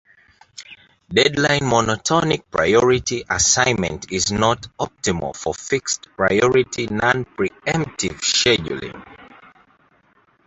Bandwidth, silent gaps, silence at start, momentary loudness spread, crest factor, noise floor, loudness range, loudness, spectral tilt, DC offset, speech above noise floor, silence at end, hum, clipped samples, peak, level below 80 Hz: 8.2 kHz; none; 0.6 s; 11 LU; 20 dB; -59 dBFS; 4 LU; -19 LUFS; -3 dB/octave; under 0.1%; 39 dB; 1.2 s; none; under 0.1%; 0 dBFS; -46 dBFS